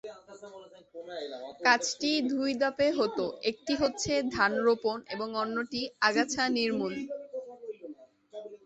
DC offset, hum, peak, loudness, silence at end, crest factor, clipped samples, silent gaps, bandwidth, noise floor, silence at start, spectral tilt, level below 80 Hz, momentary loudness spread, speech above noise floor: under 0.1%; none; -10 dBFS; -29 LUFS; 0.1 s; 22 dB; under 0.1%; none; 8.2 kHz; -50 dBFS; 0.05 s; -3 dB/octave; -64 dBFS; 20 LU; 21 dB